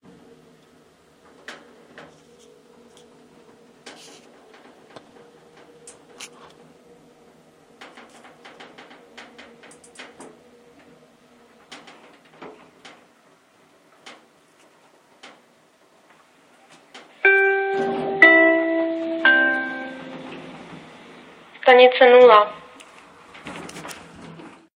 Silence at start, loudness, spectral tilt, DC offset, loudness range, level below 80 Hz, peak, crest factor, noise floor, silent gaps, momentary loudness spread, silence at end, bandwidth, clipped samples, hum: 1.5 s; -15 LUFS; -3.5 dB/octave; under 0.1%; 7 LU; -72 dBFS; 0 dBFS; 24 dB; -57 dBFS; none; 30 LU; 0.3 s; 11 kHz; under 0.1%; none